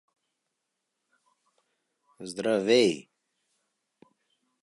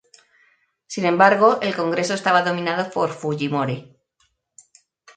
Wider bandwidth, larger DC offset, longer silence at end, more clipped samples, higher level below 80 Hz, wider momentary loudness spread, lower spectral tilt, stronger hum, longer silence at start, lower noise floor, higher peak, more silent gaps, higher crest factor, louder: first, 11.5 kHz vs 9.4 kHz; neither; first, 1.6 s vs 1.35 s; neither; second, -78 dBFS vs -68 dBFS; first, 18 LU vs 10 LU; about the same, -4 dB/octave vs -5 dB/octave; neither; first, 2.2 s vs 0.9 s; first, -83 dBFS vs -67 dBFS; second, -10 dBFS vs 0 dBFS; neither; about the same, 22 dB vs 22 dB; second, -25 LUFS vs -19 LUFS